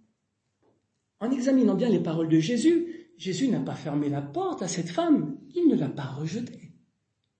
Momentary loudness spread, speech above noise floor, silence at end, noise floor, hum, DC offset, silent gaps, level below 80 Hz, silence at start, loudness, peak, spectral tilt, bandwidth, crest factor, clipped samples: 11 LU; 52 dB; 0.7 s; -78 dBFS; none; under 0.1%; none; -72 dBFS; 1.2 s; -26 LUFS; -12 dBFS; -6.5 dB/octave; 8.8 kHz; 16 dB; under 0.1%